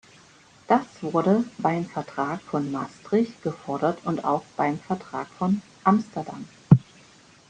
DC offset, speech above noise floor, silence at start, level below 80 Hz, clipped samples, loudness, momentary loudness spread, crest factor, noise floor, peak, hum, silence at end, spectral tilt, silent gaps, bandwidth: under 0.1%; 28 dB; 0.7 s; -58 dBFS; under 0.1%; -25 LUFS; 12 LU; 24 dB; -54 dBFS; -2 dBFS; none; 0.65 s; -8 dB/octave; none; 9.4 kHz